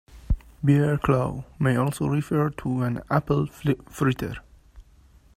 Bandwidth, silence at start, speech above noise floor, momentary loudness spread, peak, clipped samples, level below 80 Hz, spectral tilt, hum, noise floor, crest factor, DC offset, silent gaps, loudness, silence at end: 15 kHz; 0.15 s; 31 dB; 10 LU; -6 dBFS; under 0.1%; -40 dBFS; -7.5 dB/octave; none; -54 dBFS; 20 dB; under 0.1%; none; -25 LUFS; 0.55 s